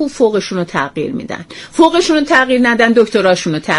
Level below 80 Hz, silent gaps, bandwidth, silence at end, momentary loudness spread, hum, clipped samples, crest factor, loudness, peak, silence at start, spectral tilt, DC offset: -46 dBFS; none; 11.5 kHz; 0 s; 12 LU; none; under 0.1%; 12 dB; -12 LUFS; 0 dBFS; 0 s; -4.5 dB/octave; under 0.1%